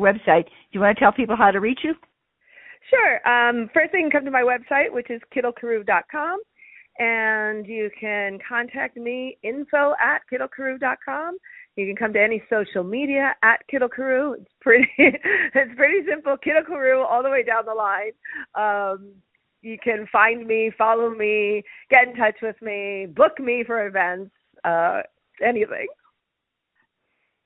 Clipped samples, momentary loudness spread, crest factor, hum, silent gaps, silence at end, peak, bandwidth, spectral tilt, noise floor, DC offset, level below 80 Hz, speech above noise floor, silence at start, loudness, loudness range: under 0.1%; 13 LU; 22 dB; none; none; 1.55 s; 0 dBFS; 4.1 kHz; -9.5 dB/octave; -81 dBFS; under 0.1%; -64 dBFS; 60 dB; 0 s; -21 LUFS; 6 LU